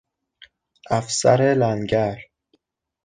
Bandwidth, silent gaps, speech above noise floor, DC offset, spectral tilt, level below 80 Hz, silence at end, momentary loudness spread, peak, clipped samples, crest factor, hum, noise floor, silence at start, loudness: 9.8 kHz; none; 48 dB; under 0.1%; -5 dB/octave; -54 dBFS; 0.8 s; 9 LU; -4 dBFS; under 0.1%; 20 dB; none; -67 dBFS; 0.9 s; -20 LUFS